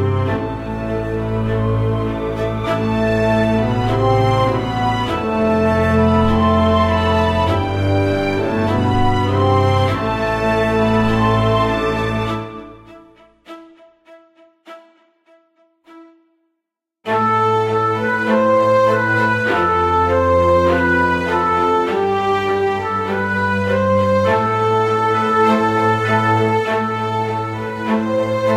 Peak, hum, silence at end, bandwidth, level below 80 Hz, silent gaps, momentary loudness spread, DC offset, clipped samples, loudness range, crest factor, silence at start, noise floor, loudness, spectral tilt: -2 dBFS; none; 0 s; 12.5 kHz; -36 dBFS; none; 6 LU; under 0.1%; under 0.1%; 5 LU; 14 dB; 0 s; -79 dBFS; -16 LUFS; -7 dB/octave